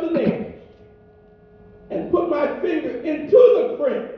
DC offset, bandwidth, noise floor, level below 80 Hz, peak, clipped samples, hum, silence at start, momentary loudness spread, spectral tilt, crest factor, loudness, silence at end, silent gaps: under 0.1%; 5.6 kHz; -50 dBFS; -54 dBFS; -2 dBFS; under 0.1%; none; 0 s; 17 LU; -9 dB/octave; 18 dB; -19 LUFS; 0 s; none